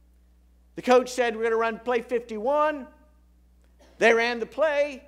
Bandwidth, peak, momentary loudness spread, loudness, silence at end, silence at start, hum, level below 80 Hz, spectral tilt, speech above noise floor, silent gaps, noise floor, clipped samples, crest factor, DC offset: 14 kHz; -6 dBFS; 9 LU; -24 LUFS; 0.1 s; 0.75 s; none; -58 dBFS; -3.5 dB/octave; 34 dB; none; -58 dBFS; under 0.1%; 20 dB; under 0.1%